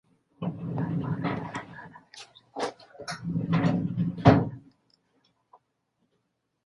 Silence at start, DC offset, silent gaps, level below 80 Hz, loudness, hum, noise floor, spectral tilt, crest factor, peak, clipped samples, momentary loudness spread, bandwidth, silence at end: 0.4 s; under 0.1%; none; -52 dBFS; -28 LUFS; none; -77 dBFS; -7.5 dB/octave; 26 dB; -2 dBFS; under 0.1%; 25 LU; 11.5 kHz; 2.05 s